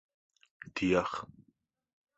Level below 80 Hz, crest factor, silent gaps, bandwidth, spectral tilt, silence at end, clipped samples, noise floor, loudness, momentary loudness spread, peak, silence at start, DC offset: -62 dBFS; 22 dB; none; 8 kHz; -6 dB/octave; 0.9 s; under 0.1%; -74 dBFS; -33 LUFS; 22 LU; -14 dBFS; 0.75 s; under 0.1%